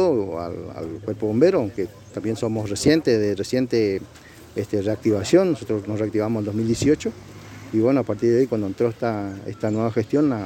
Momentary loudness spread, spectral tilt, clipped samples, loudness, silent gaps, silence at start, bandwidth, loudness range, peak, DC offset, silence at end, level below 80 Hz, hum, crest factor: 13 LU; -6.5 dB/octave; under 0.1%; -22 LUFS; none; 0 s; 16.5 kHz; 1 LU; -4 dBFS; under 0.1%; 0 s; -52 dBFS; none; 18 dB